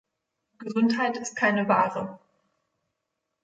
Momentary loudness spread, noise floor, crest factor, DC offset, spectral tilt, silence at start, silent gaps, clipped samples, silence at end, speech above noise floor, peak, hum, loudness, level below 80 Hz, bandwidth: 13 LU; -82 dBFS; 20 dB; under 0.1%; -5 dB/octave; 0.6 s; none; under 0.1%; 1.25 s; 57 dB; -10 dBFS; none; -25 LUFS; -74 dBFS; 9 kHz